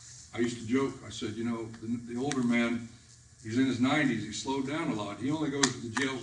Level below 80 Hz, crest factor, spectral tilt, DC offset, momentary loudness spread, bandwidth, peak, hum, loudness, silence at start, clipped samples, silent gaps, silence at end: -64 dBFS; 28 dB; -4 dB/octave; under 0.1%; 10 LU; 10.5 kHz; -4 dBFS; none; -31 LUFS; 0 s; under 0.1%; none; 0 s